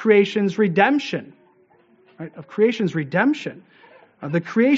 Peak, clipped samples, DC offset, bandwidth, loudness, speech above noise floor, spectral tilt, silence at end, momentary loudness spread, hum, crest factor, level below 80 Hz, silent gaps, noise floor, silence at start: -2 dBFS; under 0.1%; under 0.1%; 7.8 kHz; -20 LUFS; 37 dB; -5 dB/octave; 0 s; 19 LU; none; 20 dB; -70 dBFS; none; -57 dBFS; 0 s